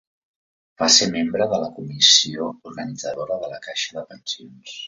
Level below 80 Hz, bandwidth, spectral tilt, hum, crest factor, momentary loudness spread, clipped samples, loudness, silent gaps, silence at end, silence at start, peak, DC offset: -62 dBFS; 7.8 kHz; -1.5 dB/octave; none; 22 dB; 19 LU; under 0.1%; -18 LUFS; none; 0 s; 0.8 s; 0 dBFS; under 0.1%